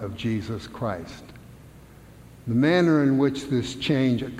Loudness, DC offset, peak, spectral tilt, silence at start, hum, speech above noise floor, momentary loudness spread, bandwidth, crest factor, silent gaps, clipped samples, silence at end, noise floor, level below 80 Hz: -24 LUFS; under 0.1%; -8 dBFS; -6.5 dB/octave; 0 s; none; 24 dB; 16 LU; 14 kHz; 16 dB; none; under 0.1%; 0 s; -47 dBFS; -52 dBFS